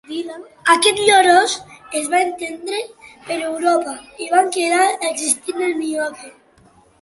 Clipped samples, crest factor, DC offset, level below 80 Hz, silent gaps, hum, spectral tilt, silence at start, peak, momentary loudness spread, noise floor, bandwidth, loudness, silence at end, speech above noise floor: under 0.1%; 18 dB; under 0.1%; -64 dBFS; none; none; -1 dB/octave; 0.1 s; 0 dBFS; 15 LU; -52 dBFS; 12 kHz; -17 LUFS; 0.7 s; 34 dB